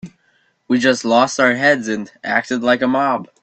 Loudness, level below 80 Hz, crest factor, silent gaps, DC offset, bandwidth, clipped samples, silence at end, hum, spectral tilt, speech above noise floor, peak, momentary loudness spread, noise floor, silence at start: -16 LUFS; -60 dBFS; 18 dB; none; under 0.1%; 8.8 kHz; under 0.1%; 0.15 s; none; -4 dB/octave; 44 dB; 0 dBFS; 7 LU; -61 dBFS; 0.05 s